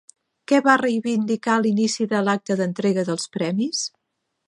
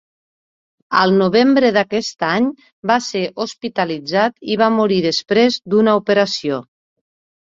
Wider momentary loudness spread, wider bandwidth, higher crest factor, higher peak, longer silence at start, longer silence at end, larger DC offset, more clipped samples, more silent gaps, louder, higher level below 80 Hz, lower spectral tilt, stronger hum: about the same, 7 LU vs 9 LU; first, 11 kHz vs 7.8 kHz; about the same, 20 dB vs 16 dB; about the same, -2 dBFS vs 0 dBFS; second, 0.5 s vs 0.9 s; second, 0.6 s vs 0.95 s; neither; neither; second, none vs 2.72-2.83 s; second, -21 LUFS vs -16 LUFS; second, -72 dBFS vs -60 dBFS; about the same, -4.5 dB/octave vs -5 dB/octave; neither